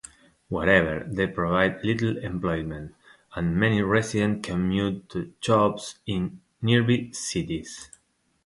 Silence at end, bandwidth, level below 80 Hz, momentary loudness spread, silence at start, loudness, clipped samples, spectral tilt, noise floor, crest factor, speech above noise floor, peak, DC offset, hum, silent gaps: 0.6 s; 11.5 kHz; -48 dBFS; 14 LU; 0.5 s; -25 LUFS; under 0.1%; -5.5 dB/octave; -68 dBFS; 20 dB; 43 dB; -4 dBFS; under 0.1%; none; none